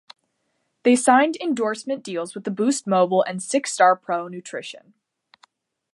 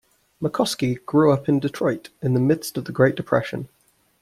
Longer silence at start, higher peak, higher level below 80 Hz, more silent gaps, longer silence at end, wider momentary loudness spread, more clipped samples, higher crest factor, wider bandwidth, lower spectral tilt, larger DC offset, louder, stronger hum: first, 0.85 s vs 0.4 s; about the same, -2 dBFS vs -4 dBFS; second, -78 dBFS vs -56 dBFS; neither; first, 1.15 s vs 0.55 s; first, 15 LU vs 11 LU; neither; about the same, 20 dB vs 18 dB; second, 11.5 kHz vs 15 kHz; second, -4 dB/octave vs -6.5 dB/octave; neither; about the same, -21 LUFS vs -22 LUFS; neither